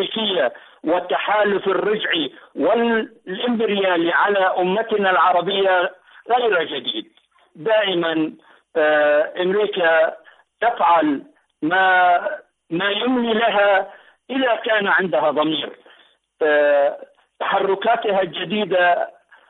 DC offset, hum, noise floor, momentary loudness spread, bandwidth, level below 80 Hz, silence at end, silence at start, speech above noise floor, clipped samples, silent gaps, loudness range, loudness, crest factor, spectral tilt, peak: under 0.1%; none; -54 dBFS; 11 LU; 4.1 kHz; -68 dBFS; 0.4 s; 0 s; 35 dB; under 0.1%; none; 2 LU; -19 LUFS; 12 dB; -8 dB/octave; -8 dBFS